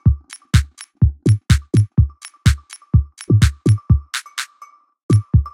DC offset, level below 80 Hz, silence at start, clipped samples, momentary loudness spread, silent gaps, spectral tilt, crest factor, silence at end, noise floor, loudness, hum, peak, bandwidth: under 0.1%; -24 dBFS; 0.05 s; under 0.1%; 11 LU; 5.03-5.09 s; -6 dB/octave; 16 dB; 0.05 s; -46 dBFS; -18 LUFS; none; 0 dBFS; 14 kHz